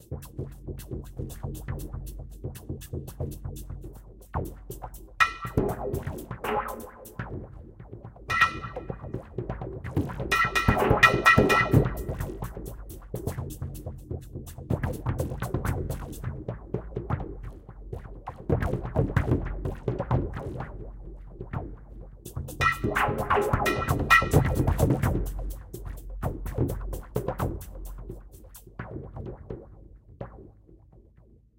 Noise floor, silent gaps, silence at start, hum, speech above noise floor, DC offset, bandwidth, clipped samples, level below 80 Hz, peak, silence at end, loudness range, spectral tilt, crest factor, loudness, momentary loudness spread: -56 dBFS; none; 0 s; none; 20 dB; under 0.1%; 17 kHz; under 0.1%; -38 dBFS; -2 dBFS; 0.6 s; 15 LU; -6 dB/octave; 26 dB; -27 LUFS; 20 LU